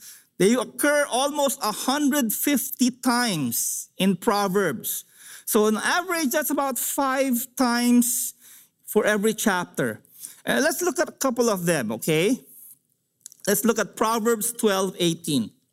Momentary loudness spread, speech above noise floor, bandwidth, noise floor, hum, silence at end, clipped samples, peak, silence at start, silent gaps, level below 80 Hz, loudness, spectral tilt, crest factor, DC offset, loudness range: 6 LU; 46 dB; 16 kHz; -69 dBFS; none; 0.25 s; under 0.1%; -6 dBFS; 0 s; none; -68 dBFS; -23 LUFS; -3.5 dB/octave; 18 dB; under 0.1%; 2 LU